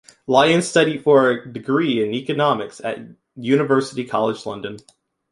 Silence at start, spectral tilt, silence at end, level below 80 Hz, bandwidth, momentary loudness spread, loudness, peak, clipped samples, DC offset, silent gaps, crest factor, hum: 0.3 s; -5 dB/octave; 0.5 s; -64 dBFS; 11.5 kHz; 14 LU; -19 LUFS; -2 dBFS; under 0.1%; under 0.1%; none; 18 dB; none